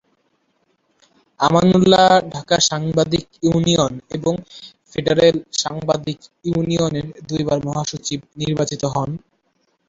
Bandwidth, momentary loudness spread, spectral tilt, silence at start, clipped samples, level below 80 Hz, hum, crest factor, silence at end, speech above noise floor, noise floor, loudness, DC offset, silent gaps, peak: 7.8 kHz; 14 LU; -5 dB/octave; 1.4 s; under 0.1%; -48 dBFS; none; 18 dB; 0.7 s; 48 dB; -66 dBFS; -18 LUFS; under 0.1%; none; -2 dBFS